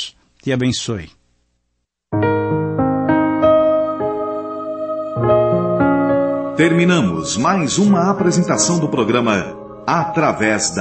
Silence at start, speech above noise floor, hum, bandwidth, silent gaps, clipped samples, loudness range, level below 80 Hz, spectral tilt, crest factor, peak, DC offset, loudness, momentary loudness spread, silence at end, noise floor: 0 s; 55 dB; none; 8.8 kHz; none; under 0.1%; 3 LU; -48 dBFS; -5 dB/octave; 14 dB; -2 dBFS; under 0.1%; -16 LUFS; 10 LU; 0 s; -71 dBFS